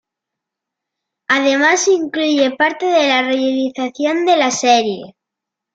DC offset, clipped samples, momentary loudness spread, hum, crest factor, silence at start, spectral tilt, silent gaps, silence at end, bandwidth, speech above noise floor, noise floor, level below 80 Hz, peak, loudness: under 0.1%; under 0.1%; 7 LU; none; 16 dB; 1.3 s; -2 dB/octave; none; 0.65 s; 9.2 kHz; 67 dB; -82 dBFS; -68 dBFS; -2 dBFS; -15 LUFS